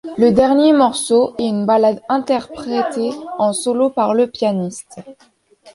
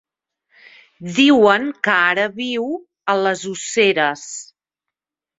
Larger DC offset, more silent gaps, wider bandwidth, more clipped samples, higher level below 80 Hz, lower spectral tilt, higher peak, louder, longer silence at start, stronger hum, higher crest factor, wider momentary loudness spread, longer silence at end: neither; neither; first, 11.5 kHz vs 8 kHz; neither; first, -54 dBFS vs -64 dBFS; first, -5 dB/octave vs -3.5 dB/octave; about the same, -2 dBFS vs -2 dBFS; about the same, -16 LUFS vs -17 LUFS; second, 0.05 s vs 1 s; neither; about the same, 14 dB vs 18 dB; second, 11 LU vs 15 LU; second, 0.05 s vs 0.95 s